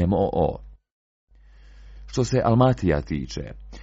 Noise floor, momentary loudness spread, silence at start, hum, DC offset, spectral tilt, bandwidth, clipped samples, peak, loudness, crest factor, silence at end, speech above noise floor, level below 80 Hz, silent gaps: -49 dBFS; 16 LU; 0 s; none; under 0.1%; -7 dB/octave; 7.8 kHz; under 0.1%; -4 dBFS; -23 LUFS; 20 dB; 0 s; 27 dB; -40 dBFS; 0.92-1.28 s